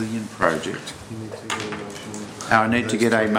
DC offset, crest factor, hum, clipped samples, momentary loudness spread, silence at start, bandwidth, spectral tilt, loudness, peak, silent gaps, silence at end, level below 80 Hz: under 0.1%; 22 dB; none; under 0.1%; 15 LU; 0 s; 16 kHz; -4.5 dB/octave; -23 LUFS; 0 dBFS; none; 0 s; -54 dBFS